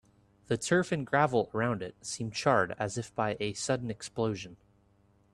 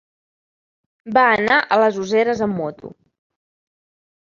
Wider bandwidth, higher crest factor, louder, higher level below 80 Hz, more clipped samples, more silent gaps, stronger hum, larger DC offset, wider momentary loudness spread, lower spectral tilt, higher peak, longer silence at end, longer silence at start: first, 12.5 kHz vs 7.4 kHz; about the same, 20 dB vs 20 dB; second, -31 LUFS vs -17 LUFS; about the same, -64 dBFS vs -60 dBFS; neither; neither; neither; neither; about the same, 10 LU vs 9 LU; about the same, -5 dB/octave vs -5 dB/octave; second, -10 dBFS vs -2 dBFS; second, 0.8 s vs 1.35 s; second, 0.5 s vs 1.05 s